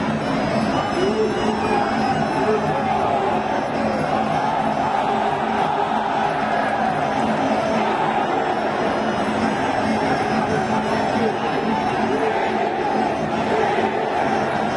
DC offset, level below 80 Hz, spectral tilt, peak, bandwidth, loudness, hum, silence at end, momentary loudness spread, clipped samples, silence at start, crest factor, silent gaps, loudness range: under 0.1%; -48 dBFS; -5.5 dB/octave; -4 dBFS; 11.5 kHz; -20 LUFS; none; 0 s; 1 LU; under 0.1%; 0 s; 16 dB; none; 0 LU